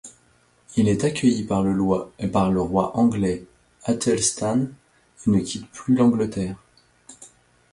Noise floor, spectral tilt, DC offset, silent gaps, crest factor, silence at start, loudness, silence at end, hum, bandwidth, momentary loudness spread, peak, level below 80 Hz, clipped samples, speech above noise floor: -60 dBFS; -5.5 dB/octave; under 0.1%; none; 16 dB; 0.05 s; -22 LUFS; 0.45 s; none; 11.5 kHz; 11 LU; -6 dBFS; -48 dBFS; under 0.1%; 39 dB